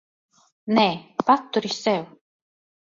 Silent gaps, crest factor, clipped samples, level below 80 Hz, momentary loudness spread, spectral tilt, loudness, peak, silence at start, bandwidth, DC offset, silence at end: none; 22 dB; under 0.1%; -68 dBFS; 11 LU; -5 dB/octave; -22 LUFS; -2 dBFS; 0.65 s; 7.6 kHz; under 0.1%; 0.85 s